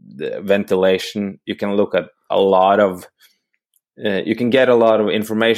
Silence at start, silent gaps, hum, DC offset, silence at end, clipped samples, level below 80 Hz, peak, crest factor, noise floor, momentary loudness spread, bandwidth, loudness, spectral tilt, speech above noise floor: 0.1 s; none; none; under 0.1%; 0 s; under 0.1%; -66 dBFS; -2 dBFS; 16 dB; -67 dBFS; 12 LU; 15.5 kHz; -17 LUFS; -6 dB/octave; 51 dB